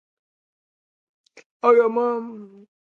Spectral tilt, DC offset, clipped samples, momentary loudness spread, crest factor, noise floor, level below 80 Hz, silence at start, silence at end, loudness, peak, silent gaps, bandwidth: -6.5 dB/octave; under 0.1%; under 0.1%; 20 LU; 22 dB; under -90 dBFS; -82 dBFS; 1.65 s; 0.5 s; -20 LUFS; -4 dBFS; none; 6.4 kHz